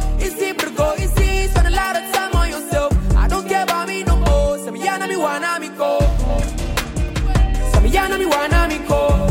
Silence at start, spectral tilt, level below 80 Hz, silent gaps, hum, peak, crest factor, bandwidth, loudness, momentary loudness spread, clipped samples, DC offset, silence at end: 0 s; -5 dB/octave; -20 dBFS; none; none; -2 dBFS; 14 dB; 17 kHz; -18 LUFS; 6 LU; under 0.1%; under 0.1%; 0 s